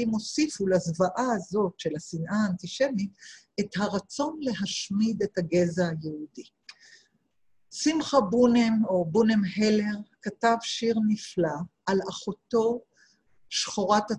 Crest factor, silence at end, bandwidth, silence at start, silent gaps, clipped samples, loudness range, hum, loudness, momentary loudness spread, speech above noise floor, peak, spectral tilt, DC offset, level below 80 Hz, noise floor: 18 dB; 0 s; 10.5 kHz; 0 s; none; under 0.1%; 5 LU; none; -27 LUFS; 11 LU; 44 dB; -8 dBFS; -5 dB/octave; under 0.1%; -64 dBFS; -71 dBFS